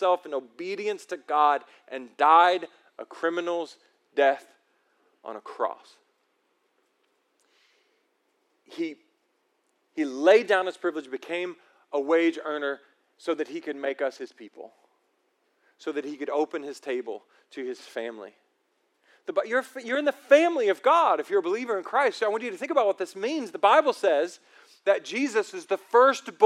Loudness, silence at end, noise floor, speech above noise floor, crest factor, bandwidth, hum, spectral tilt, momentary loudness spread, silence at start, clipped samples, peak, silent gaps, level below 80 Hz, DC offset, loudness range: -26 LUFS; 0 s; -72 dBFS; 47 dB; 22 dB; 13 kHz; none; -3 dB/octave; 20 LU; 0 s; under 0.1%; -4 dBFS; none; under -90 dBFS; under 0.1%; 16 LU